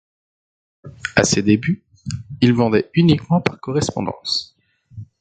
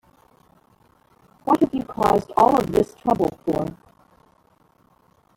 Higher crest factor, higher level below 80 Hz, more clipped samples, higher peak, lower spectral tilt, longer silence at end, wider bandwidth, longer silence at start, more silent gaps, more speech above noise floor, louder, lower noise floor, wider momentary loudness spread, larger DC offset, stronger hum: about the same, 20 dB vs 20 dB; about the same, -46 dBFS vs -50 dBFS; neither; first, 0 dBFS vs -4 dBFS; second, -5 dB/octave vs -7 dB/octave; second, 0.15 s vs 1.6 s; second, 9.2 kHz vs 17 kHz; second, 0.85 s vs 1.45 s; neither; second, 22 dB vs 40 dB; first, -18 LUFS vs -21 LUFS; second, -40 dBFS vs -60 dBFS; first, 13 LU vs 9 LU; neither; neither